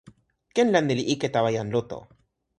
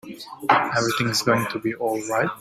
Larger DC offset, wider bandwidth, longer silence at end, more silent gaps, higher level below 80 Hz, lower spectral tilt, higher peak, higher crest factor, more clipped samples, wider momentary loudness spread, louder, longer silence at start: neither; second, 11 kHz vs 16 kHz; first, 0.55 s vs 0 s; neither; about the same, -62 dBFS vs -60 dBFS; first, -5.5 dB/octave vs -4 dB/octave; second, -6 dBFS vs -2 dBFS; about the same, 20 dB vs 20 dB; neither; first, 12 LU vs 7 LU; about the same, -24 LUFS vs -22 LUFS; about the same, 0.05 s vs 0.05 s